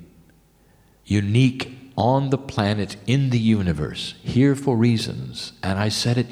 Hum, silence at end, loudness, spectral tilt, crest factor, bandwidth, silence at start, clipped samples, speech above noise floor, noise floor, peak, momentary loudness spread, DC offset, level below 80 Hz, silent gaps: none; 0 s; -22 LUFS; -6.5 dB/octave; 16 dB; 13.5 kHz; 0 s; under 0.1%; 35 dB; -56 dBFS; -6 dBFS; 10 LU; under 0.1%; -48 dBFS; none